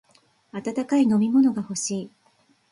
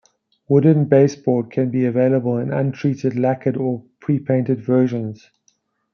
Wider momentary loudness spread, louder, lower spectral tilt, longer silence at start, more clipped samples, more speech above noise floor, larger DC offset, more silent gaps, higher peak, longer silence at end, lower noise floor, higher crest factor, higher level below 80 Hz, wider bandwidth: first, 15 LU vs 9 LU; second, -23 LUFS vs -19 LUFS; second, -5 dB/octave vs -9 dB/octave; about the same, 0.55 s vs 0.5 s; neither; second, 41 dB vs 46 dB; neither; neither; second, -10 dBFS vs -2 dBFS; second, 0.65 s vs 0.8 s; about the same, -63 dBFS vs -64 dBFS; about the same, 14 dB vs 16 dB; about the same, -68 dBFS vs -64 dBFS; first, 11.5 kHz vs 6.8 kHz